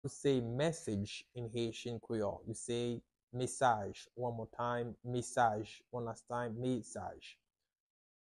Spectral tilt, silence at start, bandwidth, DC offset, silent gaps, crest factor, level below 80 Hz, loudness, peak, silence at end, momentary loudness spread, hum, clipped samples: -5.5 dB/octave; 0.05 s; 12 kHz; under 0.1%; 3.23-3.27 s; 22 dB; -68 dBFS; -39 LUFS; -16 dBFS; 0.95 s; 13 LU; none; under 0.1%